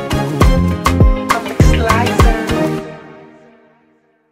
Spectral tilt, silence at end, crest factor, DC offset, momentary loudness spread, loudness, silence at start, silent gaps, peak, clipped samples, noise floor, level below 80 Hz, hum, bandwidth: -6 dB/octave; 1.1 s; 14 dB; under 0.1%; 8 LU; -14 LUFS; 0 s; none; 0 dBFS; under 0.1%; -55 dBFS; -18 dBFS; none; 16 kHz